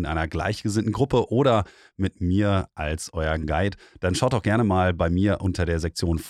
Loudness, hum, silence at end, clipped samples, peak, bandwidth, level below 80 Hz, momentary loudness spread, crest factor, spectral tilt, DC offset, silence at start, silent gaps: -24 LUFS; none; 0 s; under 0.1%; -8 dBFS; 13.5 kHz; -38 dBFS; 8 LU; 16 dB; -6.5 dB/octave; under 0.1%; 0 s; none